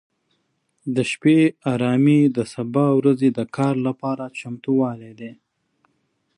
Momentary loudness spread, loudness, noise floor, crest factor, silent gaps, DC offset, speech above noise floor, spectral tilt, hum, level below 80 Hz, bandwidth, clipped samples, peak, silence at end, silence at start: 16 LU; -20 LUFS; -70 dBFS; 16 dB; none; under 0.1%; 50 dB; -7.5 dB/octave; none; -66 dBFS; 11 kHz; under 0.1%; -6 dBFS; 1.05 s; 0.85 s